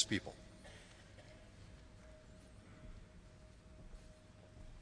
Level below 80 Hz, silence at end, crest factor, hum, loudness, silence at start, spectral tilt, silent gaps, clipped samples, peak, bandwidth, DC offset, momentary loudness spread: -60 dBFS; 0 s; 30 dB; none; -52 LUFS; 0 s; -3.5 dB/octave; none; under 0.1%; -20 dBFS; 10.5 kHz; under 0.1%; 6 LU